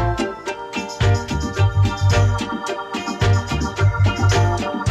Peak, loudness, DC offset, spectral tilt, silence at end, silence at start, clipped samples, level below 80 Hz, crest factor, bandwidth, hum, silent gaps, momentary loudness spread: -6 dBFS; -20 LUFS; under 0.1%; -6 dB/octave; 0 s; 0 s; under 0.1%; -30 dBFS; 12 dB; 11.5 kHz; none; none; 9 LU